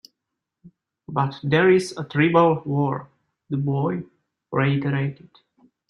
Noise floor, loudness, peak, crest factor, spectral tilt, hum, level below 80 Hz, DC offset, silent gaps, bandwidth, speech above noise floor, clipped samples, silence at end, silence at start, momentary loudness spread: -83 dBFS; -22 LUFS; -4 dBFS; 20 dB; -7.5 dB/octave; none; -62 dBFS; under 0.1%; none; 11 kHz; 62 dB; under 0.1%; 0.75 s; 0.65 s; 13 LU